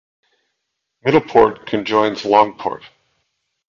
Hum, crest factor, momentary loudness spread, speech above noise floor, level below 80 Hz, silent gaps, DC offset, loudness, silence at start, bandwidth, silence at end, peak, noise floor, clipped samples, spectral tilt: none; 18 dB; 12 LU; 60 dB; -52 dBFS; none; under 0.1%; -16 LUFS; 1.05 s; 7.4 kHz; 0.95 s; 0 dBFS; -76 dBFS; under 0.1%; -6 dB/octave